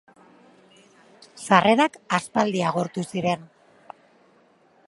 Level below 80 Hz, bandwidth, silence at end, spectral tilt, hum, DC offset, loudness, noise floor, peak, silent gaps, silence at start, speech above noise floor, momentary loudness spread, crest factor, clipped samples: -68 dBFS; 11.5 kHz; 1.4 s; -5 dB/octave; none; under 0.1%; -22 LUFS; -59 dBFS; 0 dBFS; none; 1.35 s; 37 dB; 11 LU; 24 dB; under 0.1%